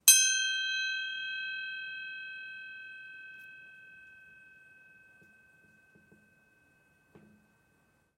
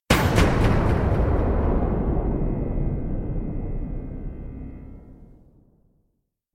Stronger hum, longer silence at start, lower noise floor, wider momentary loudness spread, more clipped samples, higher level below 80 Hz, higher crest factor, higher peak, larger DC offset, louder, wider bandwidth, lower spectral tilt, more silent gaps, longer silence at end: neither; about the same, 0.05 s vs 0.1 s; about the same, -70 dBFS vs -73 dBFS; first, 26 LU vs 18 LU; neither; second, -84 dBFS vs -28 dBFS; first, 30 dB vs 18 dB; about the same, -4 dBFS vs -4 dBFS; neither; second, -30 LUFS vs -24 LUFS; about the same, 16 kHz vs 16.5 kHz; second, 4.5 dB/octave vs -6.5 dB/octave; neither; second, 1 s vs 1.3 s